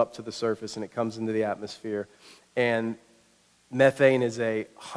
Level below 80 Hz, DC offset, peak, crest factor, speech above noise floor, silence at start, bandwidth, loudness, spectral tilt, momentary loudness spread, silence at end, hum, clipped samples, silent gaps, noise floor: -72 dBFS; under 0.1%; -6 dBFS; 22 dB; 36 dB; 0 s; 11 kHz; -27 LUFS; -5.5 dB/octave; 13 LU; 0 s; none; under 0.1%; none; -63 dBFS